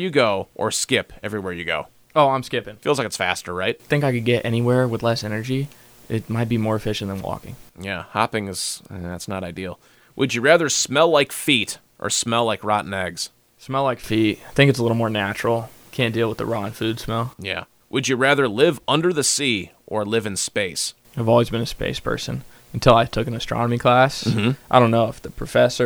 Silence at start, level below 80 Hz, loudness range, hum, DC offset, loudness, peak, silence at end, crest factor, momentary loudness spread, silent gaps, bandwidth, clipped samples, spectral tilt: 0 s; -46 dBFS; 6 LU; none; under 0.1%; -21 LUFS; 0 dBFS; 0 s; 22 dB; 13 LU; none; over 20 kHz; under 0.1%; -4.5 dB/octave